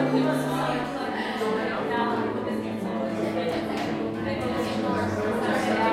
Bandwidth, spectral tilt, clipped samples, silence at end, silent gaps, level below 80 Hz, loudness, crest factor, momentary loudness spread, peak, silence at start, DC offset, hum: 16 kHz; -6 dB/octave; under 0.1%; 0 s; none; -56 dBFS; -27 LUFS; 16 dB; 5 LU; -12 dBFS; 0 s; under 0.1%; none